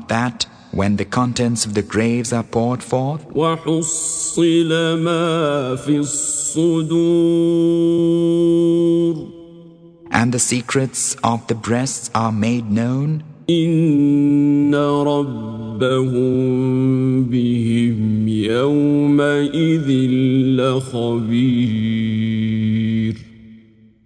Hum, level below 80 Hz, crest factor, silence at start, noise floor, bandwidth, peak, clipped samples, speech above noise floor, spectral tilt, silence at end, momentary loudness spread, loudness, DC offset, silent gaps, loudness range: none; -52 dBFS; 16 dB; 0 s; -48 dBFS; 10 kHz; 0 dBFS; under 0.1%; 31 dB; -5.5 dB/octave; 0.5 s; 6 LU; -17 LUFS; under 0.1%; none; 3 LU